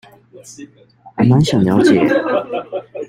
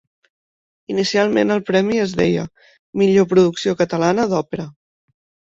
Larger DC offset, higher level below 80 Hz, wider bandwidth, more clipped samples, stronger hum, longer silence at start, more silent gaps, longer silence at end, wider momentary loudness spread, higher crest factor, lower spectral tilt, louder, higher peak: neither; about the same, -50 dBFS vs -54 dBFS; first, 15.5 kHz vs 7.8 kHz; neither; neither; second, 0.35 s vs 0.9 s; second, none vs 2.79-2.93 s; second, 0 s vs 0.8 s; first, 21 LU vs 13 LU; about the same, 14 dB vs 16 dB; about the same, -7 dB/octave vs -6 dB/octave; first, -14 LUFS vs -17 LUFS; about the same, -2 dBFS vs -2 dBFS